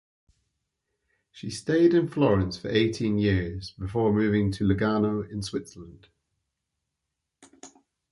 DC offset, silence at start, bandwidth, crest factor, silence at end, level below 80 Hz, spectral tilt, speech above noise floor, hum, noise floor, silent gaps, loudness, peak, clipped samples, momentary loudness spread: under 0.1%; 1.35 s; 11.5 kHz; 18 dB; 0.45 s; -48 dBFS; -7 dB/octave; 59 dB; none; -83 dBFS; none; -25 LUFS; -10 dBFS; under 0.1%; 14 LU